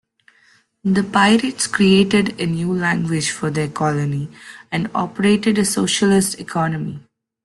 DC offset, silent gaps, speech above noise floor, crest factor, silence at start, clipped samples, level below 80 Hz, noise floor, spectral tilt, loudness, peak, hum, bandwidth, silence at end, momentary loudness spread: under 0.1%; none; 38 dB; 16 dB; 0.85 s; under 0.1%; -52 dBFS; -56 dBFS; -4.5 dB/octave; -18 LUFS; -2 dBFS; none; 12.5 kHz; 0.45 s; 12 LU